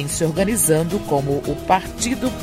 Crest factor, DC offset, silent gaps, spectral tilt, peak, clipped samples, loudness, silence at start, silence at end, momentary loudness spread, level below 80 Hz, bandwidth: 18 dB; under 0.1%; none; -4.5 dB/octave; -2 dBFS; under 0.1%; -19 LUFS; 0 s; 0 s; 6 LU; -38 dBFS; 16 kHz